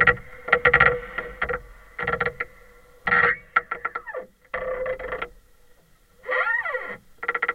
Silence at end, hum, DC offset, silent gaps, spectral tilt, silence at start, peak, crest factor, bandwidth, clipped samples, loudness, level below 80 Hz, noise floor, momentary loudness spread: 0 s; none; under 0.1%; none; -5.5 dB/octave; 0 s; 0 dBFS; 26 dB; 15.5 kHz; under 0.1%; -24 LUFS; -46 dBFS; -56 dBFS; 16 LU